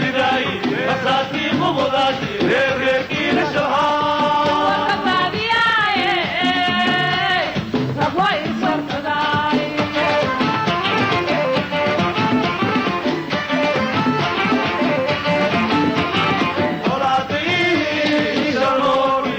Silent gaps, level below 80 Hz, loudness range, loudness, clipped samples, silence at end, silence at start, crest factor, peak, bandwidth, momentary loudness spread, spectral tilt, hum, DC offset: none; -50 dBFS; 2 LU; -18 LUFS; under 0.1%; 0 s; 0 s; 10 dB; -8 dBFS; over 20 kHz; 3 LU; -5.5 dB/octave; none; under 0.1%